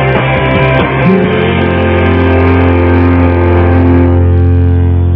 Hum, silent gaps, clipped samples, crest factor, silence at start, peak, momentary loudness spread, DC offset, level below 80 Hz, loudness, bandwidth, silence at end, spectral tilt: none; none; 1%; 8 dB; 0 s; 0 dBFS; 2 LU; under 0.1%; -20 dBFS; -8 LUFS; 4.1 kHz; 0 s; -10.5 dB/octave